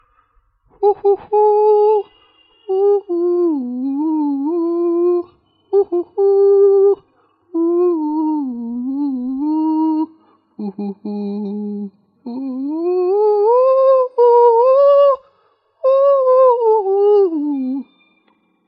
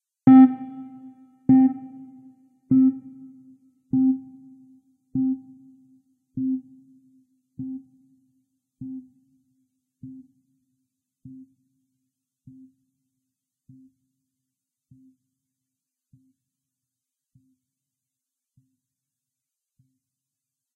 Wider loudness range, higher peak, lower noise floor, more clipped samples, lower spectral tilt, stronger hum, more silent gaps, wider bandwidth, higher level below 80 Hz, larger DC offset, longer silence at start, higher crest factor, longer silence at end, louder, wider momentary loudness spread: second, 9 LU vs 23 LU; first, -2 dBFS vs -6 dBFS; second, -60 dBFS vs -87 dBFS; neither; about the same, -10.5 dB/octave vs -11 dB/octave; neither; neither; first, 5 kHz vs 2.5 kHz; about the same, -68 dBFS vs -70 dBFS; neither; first, 0.8 s vs 0.25 s; second, 12 dB vs 22 dB; second, 0.85 s vs 10.65 s; first, -15 LUFS vs -20 LUFS; second, 14 LU vs 29 LU